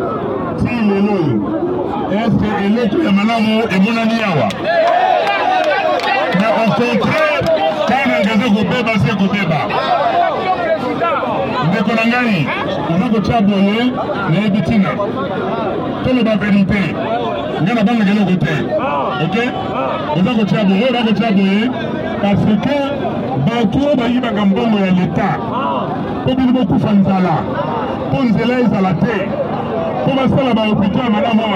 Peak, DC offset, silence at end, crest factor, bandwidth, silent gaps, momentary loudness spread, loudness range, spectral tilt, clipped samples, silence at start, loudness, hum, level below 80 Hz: -2 dBFS; under 0.1%; 0 s; 12 dB; 9.4 kHz; none; 5 LU; 2 LU; -7.5 dB/octave; under 0.1%; 0 s; -15 LUFS; none; -42 dBFS